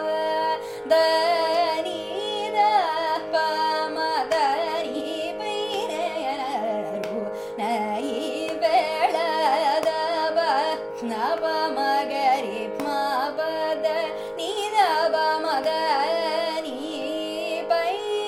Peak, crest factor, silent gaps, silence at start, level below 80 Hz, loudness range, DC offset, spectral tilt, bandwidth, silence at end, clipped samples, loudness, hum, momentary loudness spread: -8 dBFS; 16 dB; none; 0 s; -66 dBFS; 4 LU; under 0.1%; -3 dB/octave; 15.5 kHz; 0 s; under 0.1%; -24 LUFS; none; 8 LU